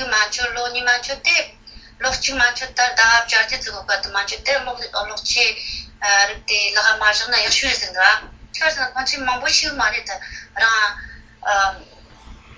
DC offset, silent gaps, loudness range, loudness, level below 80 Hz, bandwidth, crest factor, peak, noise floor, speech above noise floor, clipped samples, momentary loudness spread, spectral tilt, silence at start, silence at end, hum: under 0.1%; none; 3 LU; -17 LUFS; -44 dBFS; 8 kHz; 20 dB; 0 dBFS; -42 dBFS; 23 dB; under 0.1%; 10 LU; 0.5 dB/octave; 0 s; 0.05 s; none